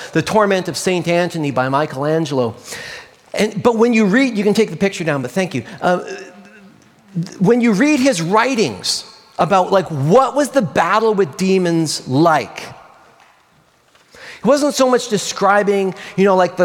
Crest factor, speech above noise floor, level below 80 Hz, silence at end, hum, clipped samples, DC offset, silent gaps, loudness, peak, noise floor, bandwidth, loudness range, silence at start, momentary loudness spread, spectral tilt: 16 dB; 39 dB; -58 dBFS; 0 s; none; under 0.1%; under 0.1%; none; -16 LUFS; 0 dBFS; -54 dBFS; 17 kHz; 4 LU; 0 s; 13 LU; -5 dB/octave